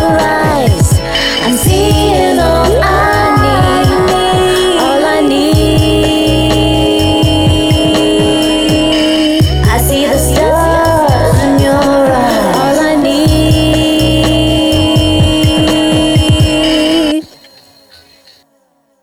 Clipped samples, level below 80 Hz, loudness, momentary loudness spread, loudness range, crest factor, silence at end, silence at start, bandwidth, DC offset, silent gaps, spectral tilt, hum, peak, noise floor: under 0.1%; -20 dBFS; -9 LUFS; 1 LU; 0 LU; 8 dB; 1.75 s; 0 s; 17.5 kHz; under 0.1%; none; -5 dB/octave; none; 0 dBFS; -54 dBFS